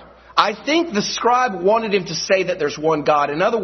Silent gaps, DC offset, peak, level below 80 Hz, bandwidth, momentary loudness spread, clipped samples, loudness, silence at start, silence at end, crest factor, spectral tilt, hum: none; under 0.1%; 0 dBFS; -54 dBFS; 6.4 kHz; 4 LU; under 0.1%; -18 LUFS; 0 s; 0 s; 18 dB; -4 dB/octave; none